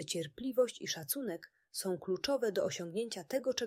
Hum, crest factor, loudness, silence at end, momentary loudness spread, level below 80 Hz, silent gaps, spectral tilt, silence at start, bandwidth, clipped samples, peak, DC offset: none; 18 dB; -37 LUFS; 0 s; 7 LU; -74 dBFS; none; -3.5 dB/octave; 0 s; 16 kHz; under 0.1%; -20 dBFS; under 0.1%